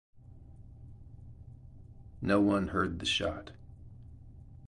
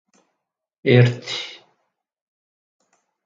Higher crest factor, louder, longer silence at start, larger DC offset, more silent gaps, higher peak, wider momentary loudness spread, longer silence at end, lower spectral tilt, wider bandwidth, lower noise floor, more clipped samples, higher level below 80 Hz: about the same, 20 dB vs 22 dB; second, -30 LUFS vs -19 LUFS; second, 0.3 s vs 0.85 s; neither; neither; second, -14 dBFS vs 0 dBFS; first, 26 LU vs 14 LU; second, 0 s vs 1.75 s; second, -5 dB/octave vs -7 dB/octave; first, 11.5 kHz vs 7.6 kHz; second, -52 dBFS vs -80 dBFS; neither; first, -52 dBFS vs -62 dBFS